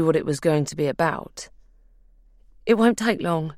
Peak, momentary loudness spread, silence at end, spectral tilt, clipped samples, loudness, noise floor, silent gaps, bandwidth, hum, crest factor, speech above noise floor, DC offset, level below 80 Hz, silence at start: -4 dBFS; 18 LU; 0.05 s; -6 dB/octave; under 0.1%; -22 LUFS; -54 dBFS; none; 16 kHz; none; 20 dB; 32 dB; under 0.1%; -54 dBFS; 0 s